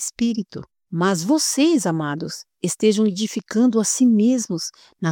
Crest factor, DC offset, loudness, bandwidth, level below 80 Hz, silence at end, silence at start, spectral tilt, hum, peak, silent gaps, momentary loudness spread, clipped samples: 14 dB; under 0.1%; -20 LUFS; 18.5 kHz; -64 dBFS; 0 s; 0 s; -4.5 dB/octave; none; -6 dBFS; none; 13 LU; under 0.1%